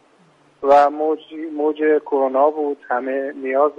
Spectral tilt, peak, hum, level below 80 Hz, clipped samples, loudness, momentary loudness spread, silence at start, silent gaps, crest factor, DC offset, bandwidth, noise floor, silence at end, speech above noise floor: -5.5 dB/octave; -4 dBFS; none; -66 dBFS; under 0.1%; -19 LUFS; 11 LU; 0.6 s; none; 16 dB; under 0.1%; 7.8 kHz; -54 dBFS; 0.05 s; 36 dB